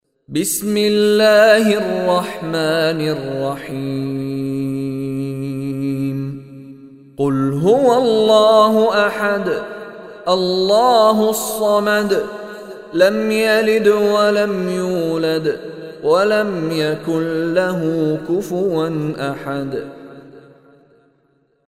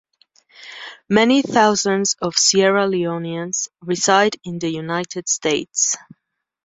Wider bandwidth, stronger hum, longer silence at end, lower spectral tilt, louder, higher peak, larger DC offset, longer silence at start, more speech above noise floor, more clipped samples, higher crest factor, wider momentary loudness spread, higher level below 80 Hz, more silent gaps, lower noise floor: first, 16 kHz vs 8 kHz; neither; first, 1.3 s vs 0.7 s; first, -5 dB/octave vs -3 dB/octave; about the same, -16 LUFS vs -18 LUFS; about the same, 0 dBFS vs -2 dBFS; neither; second, 0.3 s vs 0.6 s; first, 45 dB vs 39 dB; neither; about the same, 16 dB vs 18 dB; about the same, 13 LU vs 11 LU; first, -54 dBFS vs -62 dBFS; neither; about the same, -60 dBFS vs -57 dBFS